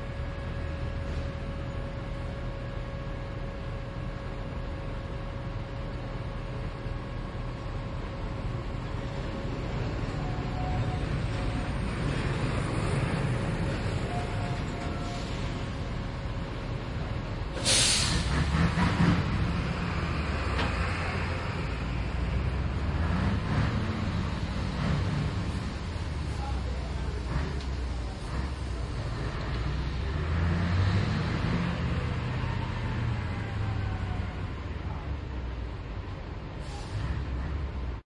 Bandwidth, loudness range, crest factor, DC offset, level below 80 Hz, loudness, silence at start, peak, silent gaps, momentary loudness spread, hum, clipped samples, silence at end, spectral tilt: 11.5 kHz; 10 LU; 20 dB; under 0.1%; -36 dBFS; -32 LUFS; 0 s; -10 dBFS; none; 9 LU; none; under 0.1%; 0.05 s; -5 dB/octave